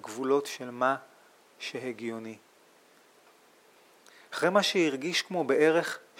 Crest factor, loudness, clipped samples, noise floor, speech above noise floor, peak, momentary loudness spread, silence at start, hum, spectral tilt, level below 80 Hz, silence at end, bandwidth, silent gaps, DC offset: 20 dB; -28 LUFS; under 0.1%; -61 dBFS; 32 dB; -10 dBFS; 15 LU; 0.05 s; none; -3.5 dB/octave; under -90 dBFS; 0.2 s; 16.5 kHz; none; under 0.1%